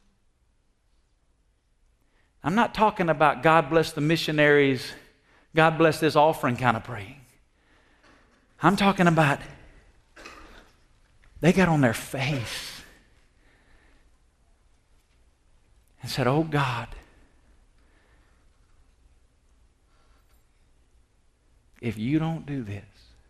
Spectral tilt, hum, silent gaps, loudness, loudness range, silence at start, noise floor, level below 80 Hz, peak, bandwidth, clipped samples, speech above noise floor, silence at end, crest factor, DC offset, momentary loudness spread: -6 dB/octave; none; none; -23 LUFS; 12 LU; 2.45 s; -67 dBFS; -54 dBFS; -4 dBFS; 13.5 kHz; under 0.1%; 44 dB; 0.5 s; 22 dB; under 0.1%; 19 LU